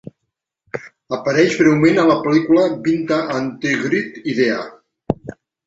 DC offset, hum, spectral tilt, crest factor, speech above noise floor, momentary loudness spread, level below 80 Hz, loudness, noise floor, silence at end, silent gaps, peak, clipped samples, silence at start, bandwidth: under 0.1%; none; -6 dB/octave; 16 dB; 61 dB; 18 LU; -54 dBFS; -17 LUFS; -77 dBFS; 0.35 s; none; 0 dBFS; under 0.1%; 0.75 s; 7.8 kHz